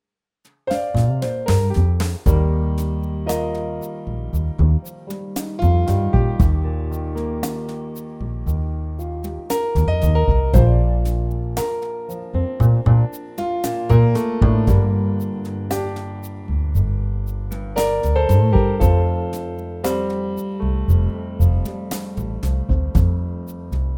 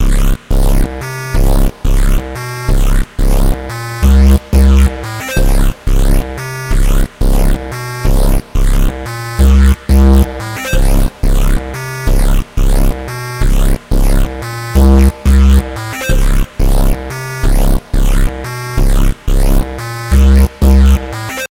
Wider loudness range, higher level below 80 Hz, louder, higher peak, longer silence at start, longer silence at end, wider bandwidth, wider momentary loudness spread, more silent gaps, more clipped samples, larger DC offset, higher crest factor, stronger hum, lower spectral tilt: about the same, 4 LU vs 4 LU; second, -24 dBFS vs -10 dBFS; second, -20 LUFS vs -14 LUFS; about the same, -2 dBFS vs 0 dBFS; first, 0.65 s vs 0 s; about the same, 0 s vs 0.05 s; first, 18.5 kHz vs 16.5 kHz; about the same, 13 LU vs 11 LU; neither; neither; neither; first, 18 dB vs 10 dB; neither; first, -8 dB/octave vs -6 dB/octave